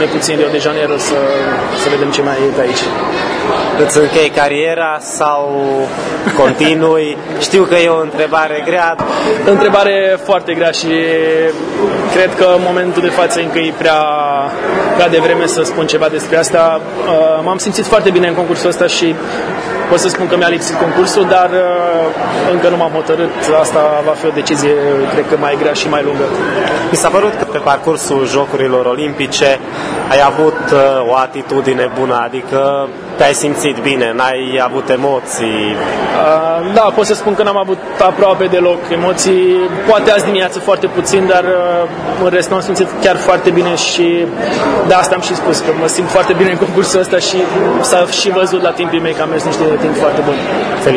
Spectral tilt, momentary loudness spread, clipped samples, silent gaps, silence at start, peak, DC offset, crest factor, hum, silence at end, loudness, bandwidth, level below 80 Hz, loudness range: -4 dB/octave; 5 LU; 0.2%; none; 0 s; 0 dBFS; under 0.1%; 12 dB; none; 0 s; -12 LUFS; 11 kHz; -46 dBFS; 2 LU